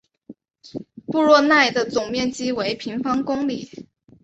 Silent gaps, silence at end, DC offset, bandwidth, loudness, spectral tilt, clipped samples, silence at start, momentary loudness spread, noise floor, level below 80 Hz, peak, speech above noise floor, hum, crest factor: none; 0.4 s; under 0.1%; 8.2 kHz; -20 LUFS; -4 dB/octave; under 0.1%; 0.3 s; 21 LU; -46 dBFS; -58 dBFS; -2 dBFS; 26 dB; none; 20 dB